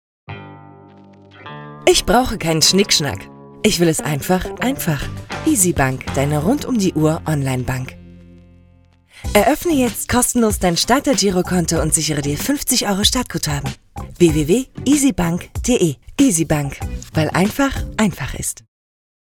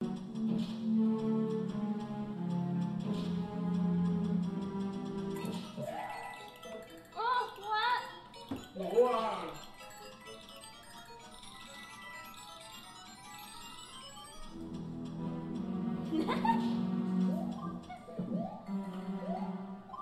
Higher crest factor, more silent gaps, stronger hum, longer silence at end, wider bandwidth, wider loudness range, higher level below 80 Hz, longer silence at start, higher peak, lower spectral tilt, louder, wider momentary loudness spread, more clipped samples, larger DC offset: about the same, 18 dB vs 20 dB; neither; neither; first, 0.7 s vs 0 s; first, 19 kHz vs 13.5 kHz; second, 3 LU vs 13 LU; first, -34 dBFS vs -64 dBFS; first, 0.3 s vs 0 s; first, 0 dBFS vs -18 dBFS; second, -4 dB/octave vs -6.5 dB/octave; first, -17 LUFS vs -36 LUFS; second, 12 LU vs 17 LU; neither; neither